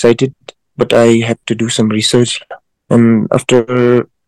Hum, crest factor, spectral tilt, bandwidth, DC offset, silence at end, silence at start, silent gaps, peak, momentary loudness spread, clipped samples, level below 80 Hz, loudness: none; 12 dB; -5.5 dB/octave; 12.5 kHz; under 0.1%; 0.25 s; 0 s; none; 0 dBFS; 8 LU; 1%; -48 dBFS; -12 LUFS